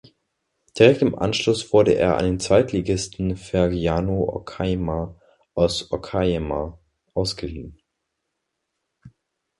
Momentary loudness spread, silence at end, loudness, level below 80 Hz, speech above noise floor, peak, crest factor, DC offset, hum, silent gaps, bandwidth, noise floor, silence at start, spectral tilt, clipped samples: 14 LU; 0.5 s; -21 LUFS; -40 dBFS; 58 dB; 0 dBFS; 22 dB; under 0.1%; none; none; 11.5 kHz; -78 dBFS; 0.75 s; -5.5 dB/octave; under 0.1%